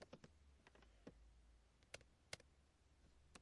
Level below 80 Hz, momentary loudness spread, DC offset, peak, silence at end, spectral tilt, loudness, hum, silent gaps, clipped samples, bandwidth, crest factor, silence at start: -74 dBFS; 9 LU; under 0.1%; -32 dBFS; 0 s; -3 dB/octave; -62 LUFS; none; none; under 0.1%; 10.5 kHz; 34 dB; 0 s